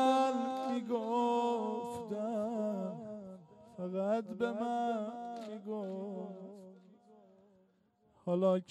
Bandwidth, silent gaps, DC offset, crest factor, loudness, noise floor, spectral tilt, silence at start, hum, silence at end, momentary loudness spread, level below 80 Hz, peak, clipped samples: 13 kHz; none; under 0.1%; 18 dB; -36 LUFS; -72 dBFS; -6.5 dB/octave; 0 s; none; 0.05 s; 17 LU; -84 dBFS; -18 dBFS; under 0.1%